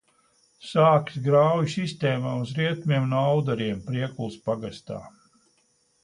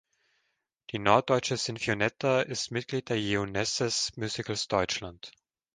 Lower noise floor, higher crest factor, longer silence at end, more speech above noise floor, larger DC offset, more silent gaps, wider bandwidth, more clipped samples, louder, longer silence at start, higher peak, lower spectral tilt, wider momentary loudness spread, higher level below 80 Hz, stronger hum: second, -67 dBFS vs -79 dBFS; second, 18 dB vs 24 dB; first, 0.95 s vs 0.45 s; second, 43 dB vs 49 dB; neither; neither; about the same, 10.5 kHz vs 10.5 kHz; neither; first, -24 LUFS vs -29 LUFS; second, 0.6 s vs 0.9 s; about the same, -6 dBFS vs -6 dBFS; first, -7 dB/octave vs -3.5 dB/octave; first, 13 LU vs 9 LU; about the same, -62 dBFS vs -58 dBFS; neither